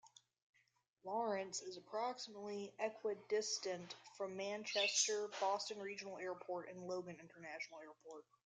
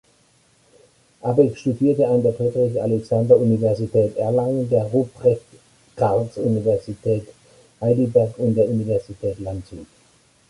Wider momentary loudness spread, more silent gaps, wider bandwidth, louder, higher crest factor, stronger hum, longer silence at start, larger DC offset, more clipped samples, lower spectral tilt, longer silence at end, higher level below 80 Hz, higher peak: first, 16 LU vs 10 LU; first, 0.42-0.53 s vs none; second, 10 kHz vs 11.5 kHz; second, -43 LUFS vs -20 LUFS; about the same, 22 dB vs 18 dB; neither; second, 0.05 s vs 1.25 s; neither; neither; second, -1.5 dB/octave vs -9.5 dB/octave; second, 0.25 s vs 0.65 s; second, under -90 dBFS vs -52 dBFS; second, -24 dBFS vs -2 dBFS